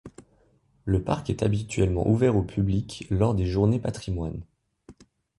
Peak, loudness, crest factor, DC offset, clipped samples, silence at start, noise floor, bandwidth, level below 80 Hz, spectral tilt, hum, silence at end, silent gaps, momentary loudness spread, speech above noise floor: -8 dBFS; -26 LUFS; 18 dB; under 0.1%; under 0.1%; 0.05 s; -63 dBFS; 11.5 kHz; -40 dBFS; -7.5 dB/octave; none; 0.45 s; none; 9 LU; 39 dB